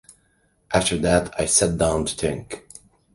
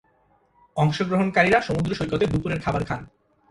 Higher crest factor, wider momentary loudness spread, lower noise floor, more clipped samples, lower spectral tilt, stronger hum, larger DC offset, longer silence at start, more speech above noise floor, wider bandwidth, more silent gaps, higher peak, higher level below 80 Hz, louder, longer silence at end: about the same, 20 dB vs 20 dB; first, 14 LU vs 10 LU; about the same, -64 dBFS vs -62 dBFS; neither; second, -3.5 dB/octave vs -6.5 dB/octave; neither; neither; about the same, 0.7 s vs 0.75 s; about the same, 43 dB vs 40 dB; about the same, 11.5 kHz vs 11.5 kHz; neither; about the same, -4 dBFS vs -4 dBFS; first, -40 dBFS vs -46 dBFS; about the same, -21 LUFS vs -23 LUFS; about the same, 0.55 s vs 0.45 s